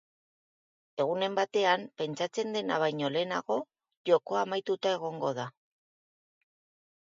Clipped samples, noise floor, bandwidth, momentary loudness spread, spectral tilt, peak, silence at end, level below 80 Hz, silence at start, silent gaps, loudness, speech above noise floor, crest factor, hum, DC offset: under 0.1%; under -90 dBFS; 7.6 kHz; 10 LU; -4.5 dB/octave; -10 dBFS; 1.5 s; -84 dBFS; 0.95 s; 3.97-4.04 s; -31 LUFS; over 60 dB; 22 dB; none; under 0.1%